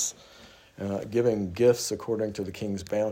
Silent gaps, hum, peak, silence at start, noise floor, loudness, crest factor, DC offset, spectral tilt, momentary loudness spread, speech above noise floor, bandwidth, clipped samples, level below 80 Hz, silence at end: none; none; -10 dBFS; 0 s; -53 dBFS; -28 LUFS; 18 dB; under 0.1%; -5 dB/octave; 11 LU; 26 dB; 16 kHz; under 0.1%; -62 dBFS; 0 s